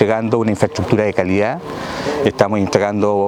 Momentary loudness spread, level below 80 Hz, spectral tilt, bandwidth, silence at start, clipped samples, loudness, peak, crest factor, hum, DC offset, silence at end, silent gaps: 7 LU; -48 dBFS; -6.5 dB/octave; 15 kHz; 0 s; under 0.1%; -17 LUFS; 0 dBFS; 16 dB; none; under 0.1%; 0 s; none